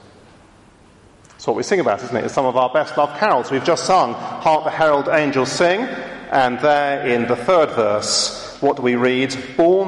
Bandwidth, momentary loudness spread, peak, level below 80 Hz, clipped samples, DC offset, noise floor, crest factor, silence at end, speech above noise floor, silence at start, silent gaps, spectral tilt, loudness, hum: 11.5 kHz; 6 LU; -2 dBFS; -56 dBFS; under 0.1%; under 0.1%; -48 dBFS; 16 dB; 0 s; 31 dB; 1.4 s; none; -4 dB/octave; -18 LUFS; none